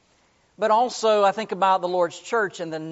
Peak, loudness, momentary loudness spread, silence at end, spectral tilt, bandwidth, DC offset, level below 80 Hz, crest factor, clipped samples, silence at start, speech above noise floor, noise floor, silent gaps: -8 dBFS; -22 LUFS; 8 LU; 0 s; -2.5 dB/octave; 8 kHz; under 0.1%; -74 dBFS; 16 dB; under 0.1%; 0.6 s; 40 dB; -62 dBFS; none